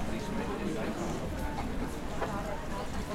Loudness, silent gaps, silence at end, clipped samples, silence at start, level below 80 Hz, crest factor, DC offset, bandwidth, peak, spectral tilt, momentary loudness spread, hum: -36 LUFS; none; 0 s; under 0.1%; 0 s; -42 dBFS; 14 dB; under 0.1%; 16 kHz; -20 dBFS; -5.5 dB/octave; 3 LU; none